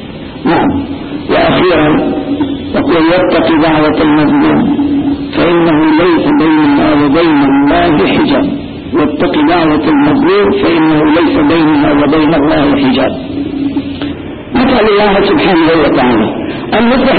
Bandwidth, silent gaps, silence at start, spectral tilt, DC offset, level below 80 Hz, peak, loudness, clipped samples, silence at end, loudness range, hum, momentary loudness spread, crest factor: 4.7 kHz; none; 0 s; -12.5 dB/octave; under 0.1%; -32 dBFS; 0 dBFS; -9 LUFS; under 0.1%; 0 s; 2 LU; none; 8 LU; 8 dB